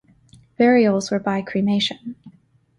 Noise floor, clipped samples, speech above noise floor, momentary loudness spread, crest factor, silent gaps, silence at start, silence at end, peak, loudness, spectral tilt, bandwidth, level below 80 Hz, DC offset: -53 dBFS; under 0.1%; 34 dB; 12 LU; 16 dB; none; 0.6 s; 0.5 s; -4 dBFS; -19 LUFS; -5.5 dB/octave; 11 kHz; -60 dBFS; under 0.1%